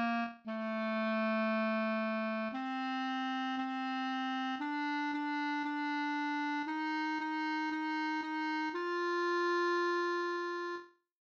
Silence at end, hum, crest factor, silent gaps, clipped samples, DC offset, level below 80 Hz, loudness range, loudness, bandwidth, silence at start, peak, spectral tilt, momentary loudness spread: 0.45 s; none; 12 dB; none; under 0.1%; under 0.1%; -88 dBFS; 2 LU; -35 LUFS; 7.6 kHz; 0 s; -24 dBFS; -5 dB/octave; 5 LU